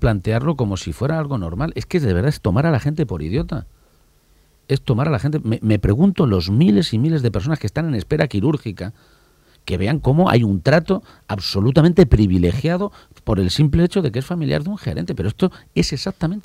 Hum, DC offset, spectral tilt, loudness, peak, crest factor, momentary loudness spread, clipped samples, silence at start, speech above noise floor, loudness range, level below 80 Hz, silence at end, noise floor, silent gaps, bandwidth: none; under 0.1%; -7.5 dB/octave; -19 LUFS; 0 dBFS; 18 dB; 10 LU; under 0.1%; 0 s; 38 dB; 5 LU; -34 dBFS; 0.05 s; -55 dBFS; none; 13.5 kHz